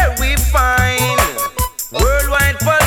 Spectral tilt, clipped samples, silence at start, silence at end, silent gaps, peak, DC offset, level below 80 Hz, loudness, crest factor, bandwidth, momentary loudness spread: -3.5 dB/octave; under 0.1%; 0 s; 0 s; none; 0 dBFS; under 0.1%; -20 dBFS; -15 LUFS; 14 dB; over 20 kHz; 6 LU